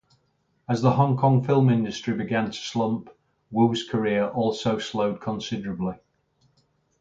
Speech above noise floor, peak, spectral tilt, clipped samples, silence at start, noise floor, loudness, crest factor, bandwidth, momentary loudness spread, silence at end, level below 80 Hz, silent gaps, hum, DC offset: 46 dB; -6 dBFS; -7 dB/octave; under 0.1%; 0.7 s; -69 dBFS; -24 LUFS; 20 dB; 7.8 kHz; 11 LU; 1.05 s; -60 dBFS; none; none; under 0.1%